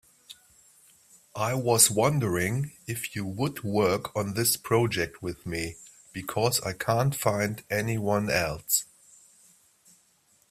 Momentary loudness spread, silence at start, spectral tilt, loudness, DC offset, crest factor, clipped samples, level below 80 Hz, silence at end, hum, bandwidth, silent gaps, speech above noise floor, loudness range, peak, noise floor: 11 LU; 0.3 s; -4 dB/octave; -27 LUFS; under 0.1%; 24 dB; under 0.1%; -58 dBFS; 1.65 s; none; 16 kHz; none; 38 dB; 3 LU; -4 dBFS; -65 dBFS